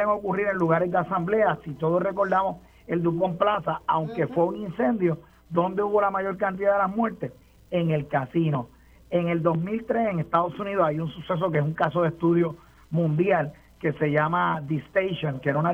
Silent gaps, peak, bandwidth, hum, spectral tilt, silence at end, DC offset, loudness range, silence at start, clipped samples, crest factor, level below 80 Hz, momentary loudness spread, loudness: none; -6 dBFS; 5.6 kHz; none; -9 dB/octave; 0 s; under 0.1%; 2 LU; 0 s; under 0.1%; 18 dB; -56 dBFS; 7 LU; -25 LUFS